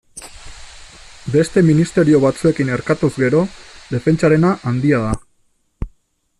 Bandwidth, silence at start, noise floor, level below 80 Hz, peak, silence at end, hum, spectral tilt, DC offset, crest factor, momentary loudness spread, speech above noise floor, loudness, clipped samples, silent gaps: 11.5 kHz; 0.15 s; -60 dBFS; -40 dBFS; -2 dBFS; 0.5 s; none; -7 dB/octave; under 0.1%; 14 dB; 19 LU; 46 dB; -16 LUFS; under 0.1%; none